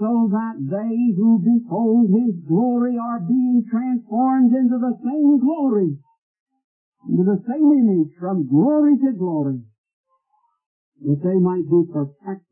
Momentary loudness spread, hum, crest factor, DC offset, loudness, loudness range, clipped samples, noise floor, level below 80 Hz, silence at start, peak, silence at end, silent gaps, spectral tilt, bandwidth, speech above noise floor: 9 LU; none; 12 dB; under 0.1%; -19 LUFS; 3 LU; under 0.1%; -67 dBFS; -72 dBFS; 0 s; -6 dBFS; 0.15 s; 6.18-6.34 s, 6.40-6.46 s, 6.64-6.92 s, 9.78-9.84 s, 9.93-10.04 s, 10.66-10.92 s; -15.5 dB/octave; 2.9 kHz; 49 dB